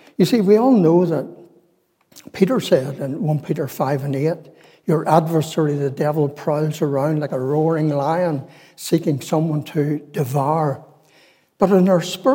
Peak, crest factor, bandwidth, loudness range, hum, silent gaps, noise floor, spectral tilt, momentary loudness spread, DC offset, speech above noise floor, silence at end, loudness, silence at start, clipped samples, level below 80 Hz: -2 dBFS; 18 dB; 17 kHz; 3 LU; none; none; -62 dBFS; -7 dB/octave; 10 LU; under 0.1%; 44 dB; 0 s; -19 LUFS; 0.2 s; under 0.1%; -68 dBFS